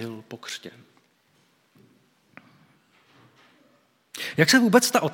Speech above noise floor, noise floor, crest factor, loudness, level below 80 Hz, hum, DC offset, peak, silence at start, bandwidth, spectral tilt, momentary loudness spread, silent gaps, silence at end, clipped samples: 43 dB; -64 dBFS; 24 dB; -21 LUFS; -76 dBFS; none; under 0.1%; -2 dBFS; 0 s; 17 kHz; -3.5 dB/octave; 23 LU; none; 0 s; under 0.1%